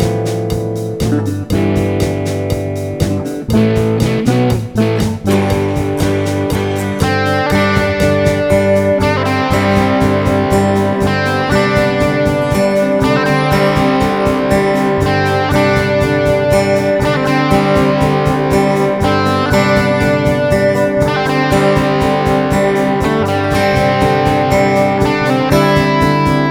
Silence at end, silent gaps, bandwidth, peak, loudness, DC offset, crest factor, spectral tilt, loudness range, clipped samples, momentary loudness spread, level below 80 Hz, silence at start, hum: 0 s; none; 19.5 kHz; 0 dBFS; -13 LUFS; under 0.1%; 12 dB; -6.5 dB/octave; 2 LU; under 0.1%; 4 LU; -30 dBFS; 0 s; none